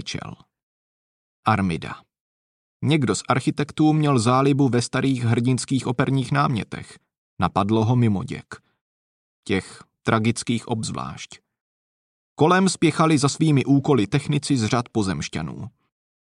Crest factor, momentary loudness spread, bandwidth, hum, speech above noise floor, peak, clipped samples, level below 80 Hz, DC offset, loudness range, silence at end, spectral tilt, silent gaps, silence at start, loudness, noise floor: 18 dB; 16 LU; 11 kHz; none; over 69 dB; -4 dBFS; under 0.1%; -54 dBFS; under 0.1%; 7 LU; 0.6 s; -6 dB/octave; 0.63-1.43 s, 2.21-2.80 s, 7.18-7.37 s, 8.81-9.43 s, 11.61-12.36 s; 0 s; -21 LUFS; under -90 dBFS